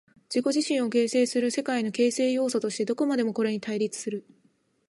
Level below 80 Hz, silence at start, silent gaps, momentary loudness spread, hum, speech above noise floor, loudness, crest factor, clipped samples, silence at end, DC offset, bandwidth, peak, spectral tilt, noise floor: -80 dBFS; 0.3 s; none; 6 LU; none; 41 dB; -26 LUFS; 14 dB; under 0.1%; 0.7 s; under 0.1%; 11.5 kHz; -12 dBFS; -4 dB/octave; -67 dBFS